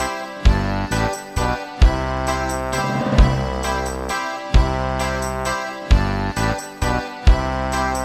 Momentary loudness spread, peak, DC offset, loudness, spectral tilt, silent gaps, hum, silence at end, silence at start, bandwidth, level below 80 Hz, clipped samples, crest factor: 6 LU; -2 dBFS; under 0.1%; -21 LUFS; -5.5 dB/octave; none; none; 0 s; 0 s; 14 kHz; -22 dBFS; under 0.1%; 18 dB